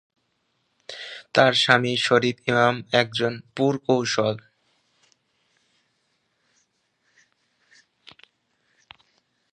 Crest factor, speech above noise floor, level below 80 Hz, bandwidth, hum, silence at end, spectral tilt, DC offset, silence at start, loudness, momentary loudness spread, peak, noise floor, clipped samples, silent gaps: 26 dB; 51 dB; -68 dBFS; 10.5 kHz; none; 5.15 s; -4.5 dB/octave; under 0.1%; 0.9 s; -21 LUFS; 18 LU; 0 dBFS; -72 dBFS; under 0.1%; none